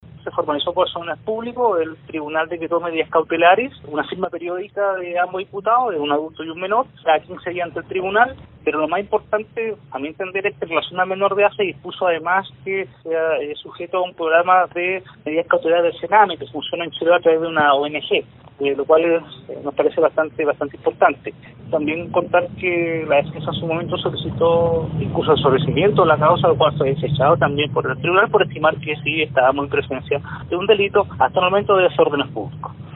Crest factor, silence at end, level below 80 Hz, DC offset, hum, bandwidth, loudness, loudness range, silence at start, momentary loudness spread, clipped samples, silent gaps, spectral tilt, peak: 18 dB; 0 s; -50 dBFS; under 0.1%; none; 4.1 kHz; -19 LUFS; 5 LU; 0.15 s; 10 LU; under 0.1%; none; -3.5 dB/octave; 0 dBFS